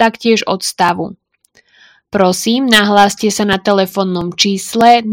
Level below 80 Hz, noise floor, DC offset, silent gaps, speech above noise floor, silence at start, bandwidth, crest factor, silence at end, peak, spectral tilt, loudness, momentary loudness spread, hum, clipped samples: -48 dBFS; -53 dBFS; under 0.1%; none; 41 dB; 0 s; over 20 kHz; 12 dB; 0 s; 0 dBFS; -3.5 dB/octave; -12 LUFS; 8 LU; none; 0.5%